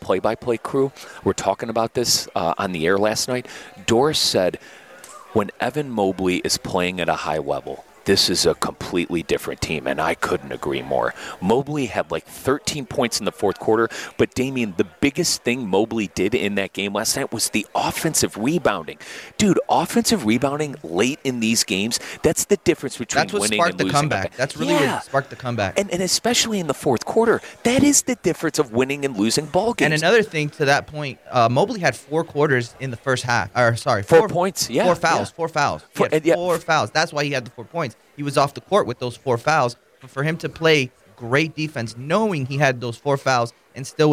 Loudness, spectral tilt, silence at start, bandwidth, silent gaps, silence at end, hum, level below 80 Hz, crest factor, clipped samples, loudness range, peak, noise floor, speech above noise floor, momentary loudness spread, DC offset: -21 LUFS; -4 dB/octave; 0 s; 16 kHz; none; 0 s; none; -52 dBFS; 16 dB; under 0.1%; 3 LU; -4 dBFS; -42 dBFS; 21 dB; 9 LU; under 0.1%